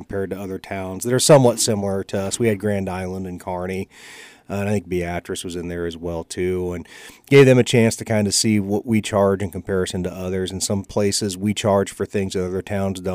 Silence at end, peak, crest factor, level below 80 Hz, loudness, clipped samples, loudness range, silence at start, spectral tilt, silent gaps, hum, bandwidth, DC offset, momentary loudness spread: 0 s; -4 dBFS; 18 dB; -54 dBFS; -20 LUFS; under 0.1%; 9 LU; 0 s; -5 dB/octave; none; none; 16 kHz; under 0.1%; 15 LU